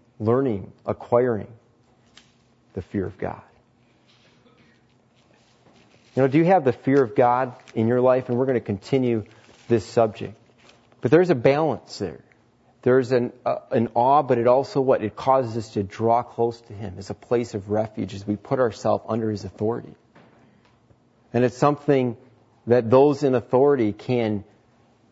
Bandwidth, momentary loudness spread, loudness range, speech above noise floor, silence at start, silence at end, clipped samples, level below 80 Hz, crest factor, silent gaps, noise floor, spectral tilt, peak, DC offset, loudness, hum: 8 kHz; 14 LU; 8 LU; 38 dB; 0.2 s; 0.7 s; under 0.1%; -62 dBFS; 20 dB; none; -60 dBFS; -8 dB/octave; -4 dBFS; under 0.1%; -22 LUFS; none